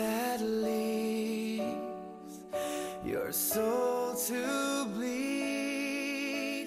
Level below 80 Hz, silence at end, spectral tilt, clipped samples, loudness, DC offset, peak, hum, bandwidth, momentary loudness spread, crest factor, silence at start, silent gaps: -68 dBFS; 0 s; -3.5 dB/octave; under 0.1%; -33 LUFS; under 0.1%; -20 dBFS; none; 16 kHz; 7 LU; 14 dB; 0 s; none